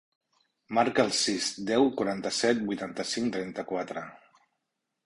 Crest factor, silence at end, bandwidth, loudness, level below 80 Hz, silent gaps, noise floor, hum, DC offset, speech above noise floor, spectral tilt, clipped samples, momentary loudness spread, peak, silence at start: 20 dB; 0.9 s; 11.5 kHz; -28 LUFS; -68 dBFS; none; -83 dBFS; none; under 0.1%; 54 dB; -3.5 dB/octave; under 0.1%; 9 LU; -10 dBFS; 0.7 s